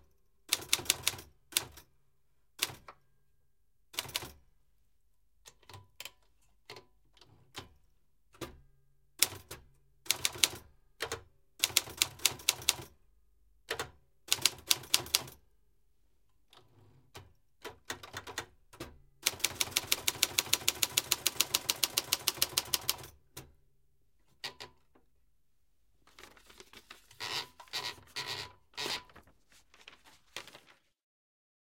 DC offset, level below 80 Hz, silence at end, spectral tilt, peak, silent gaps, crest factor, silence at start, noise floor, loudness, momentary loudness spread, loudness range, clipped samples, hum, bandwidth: under 0.1%; -66 dBFS; 1.15 s; 0.5 dB/octave; -2 dBFS; none; 38 dB; 0.5 s; -78 dBFS; -32 LUFS; 22 LU; 21 LU; under 0.1%; none; 17 kHz